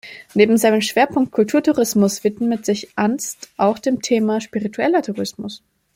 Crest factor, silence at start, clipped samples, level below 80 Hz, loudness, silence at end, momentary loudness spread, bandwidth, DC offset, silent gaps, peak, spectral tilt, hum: 16 dB; 0.05 s; under 0.1%; -60 dBFS; -18 LUFS; 0.4 s; 10 LU; 16.5 kHz; under 0.1%; none; -2 dBFS; -4.5 dB/octave; none